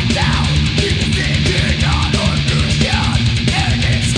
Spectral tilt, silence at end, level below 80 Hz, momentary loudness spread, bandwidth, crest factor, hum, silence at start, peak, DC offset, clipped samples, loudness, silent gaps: -4.5 dB/octave; 0 s; -22 dBFS; 1 LU; 10 kHz; 14 dB; none; 0 s; 0 dBFS; under 0.1%; under 0.1%; -15 LUFS; none